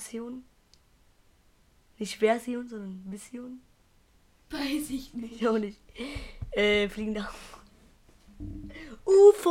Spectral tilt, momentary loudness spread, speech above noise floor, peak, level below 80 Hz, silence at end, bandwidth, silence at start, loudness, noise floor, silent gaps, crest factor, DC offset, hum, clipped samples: -4.5 dB/octave; 20 LU; 36 dB; -8 dBFS; -52 dBFS; 0 s; 15.5 kHz; 0 s; -27 LUFS; -63 dBFS; none; 22 dB; under 0.1%; none; under 0.1%